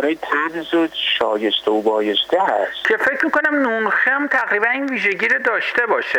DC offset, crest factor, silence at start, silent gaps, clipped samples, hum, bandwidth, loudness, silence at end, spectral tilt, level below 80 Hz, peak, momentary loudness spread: under 0.1%; 12 dB; 0 s; none; under 0.1%; none; 19 kHz; -17 LUFS; 0 s; -3.5 dB/octave; -62 dBFS; -6 dBFS; 3 LU